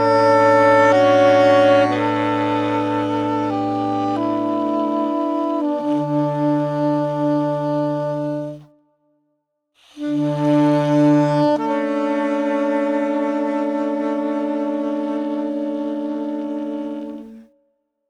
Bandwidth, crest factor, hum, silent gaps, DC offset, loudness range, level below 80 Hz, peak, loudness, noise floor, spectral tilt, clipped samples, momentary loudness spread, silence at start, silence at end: 9.8 kHz; 14 dB; none; none; under 0.1%; 8 LU; -60 dBFS; -4 dBFS; -18 LUFS; -71 dBFS; -7 dB/octave; under 0.1%; 12 LU; 0 s; 0.7 s